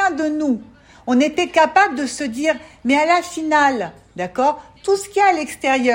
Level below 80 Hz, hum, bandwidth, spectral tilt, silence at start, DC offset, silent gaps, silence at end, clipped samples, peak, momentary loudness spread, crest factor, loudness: -56 dBFS; none; 16.5 kHz; -3.5 dB/octave; 0 s; under 0.1%; none; 0 s; under 0.1%; -2 dBFS; 11 LU; 16 dB; -18 LUFS